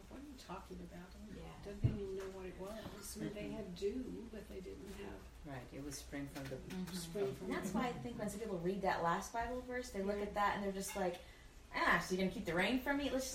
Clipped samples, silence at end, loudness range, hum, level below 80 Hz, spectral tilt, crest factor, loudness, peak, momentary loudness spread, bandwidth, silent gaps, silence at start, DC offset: under 0.1%; 0 s; 9 LU; none; -58 dBFS; -5 dB/octave; 22 dB; -41 LUFS; -20 dBFS; 16 LU; 16 kHz; none; 0 s; under 0.1%